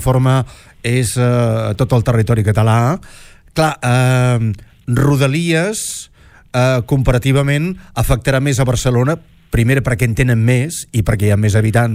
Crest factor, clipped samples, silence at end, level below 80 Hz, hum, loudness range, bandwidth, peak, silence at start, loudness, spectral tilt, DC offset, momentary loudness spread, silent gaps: 12 dB; under 0.1%; 0 s; -30 dBFS; none; 1 LU; 15.5 kHz; -2 dBFS; 0 s; -15 LUFS; -6 dB/octave; under 0.1%; 8 LU; none